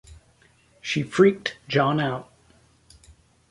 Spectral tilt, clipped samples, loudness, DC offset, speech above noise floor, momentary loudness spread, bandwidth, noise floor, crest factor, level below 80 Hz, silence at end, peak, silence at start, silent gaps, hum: -6 dB/octave; under 0.1%; -23 LUFS; under 0.1%; 37 dB; 14 LU; 11.5 kHz; -59 dBFS; 22 dB; -58 dBFS; 1.25 s; -4 dBFS; 0.1 s; none; none